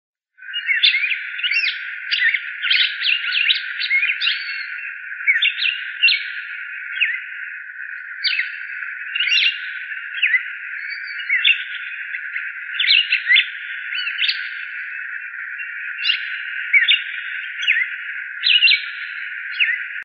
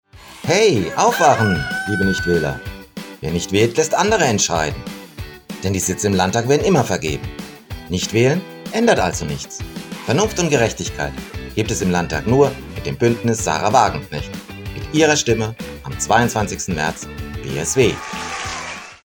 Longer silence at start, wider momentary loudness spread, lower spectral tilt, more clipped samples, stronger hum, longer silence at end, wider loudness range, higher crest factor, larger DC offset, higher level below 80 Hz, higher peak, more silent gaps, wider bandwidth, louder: first, 0.4 s vs 0.15 s; about the same, 14 LU vs 15 LU; second, 8.5 dB/octave vs -4.5 dB/octave; neither; neither; about the same, 0 s vs 0.1 s; about the same, 4 LU vs 2 LU; about the same, 20 dB vs 18 dB; neither; second, under -90 dBFS vs -38 dBFS; about the same, 0 dBFS vs 0 dBFS; neither; second, 6.6 kHz vs 19.5 kHz; about the same, -18 LUFS vs -18 LUFS